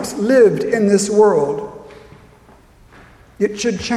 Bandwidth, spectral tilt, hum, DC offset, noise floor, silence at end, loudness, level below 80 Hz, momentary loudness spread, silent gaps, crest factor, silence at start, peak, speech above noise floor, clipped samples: 13.5 kHz; -5 dB/octave; none; under 0.1%; -47 dBFS; 0 s; -15 LUFS; -50 dBFS; 10 LU; none; 16 dB; 0 s; -2 dBFS; 32 dB; under 0.1%